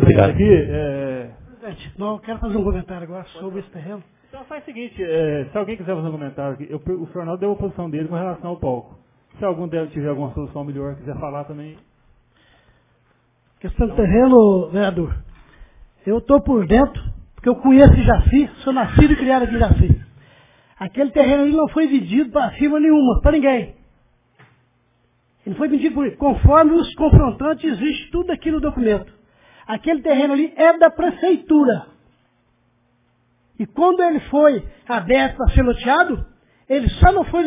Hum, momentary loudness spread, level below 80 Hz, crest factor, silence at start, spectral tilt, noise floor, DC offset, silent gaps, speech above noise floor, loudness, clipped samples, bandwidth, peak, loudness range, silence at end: none; 18 LU; -26 dBFS; 18 dB; 0 s; -11.5 dB/octave; -62 dBFS; under 0.1%; none; 45 dB; -17 LUFS; under 0.1%; 3.8 kHz; 0 dBFS; 12 LU; 0 s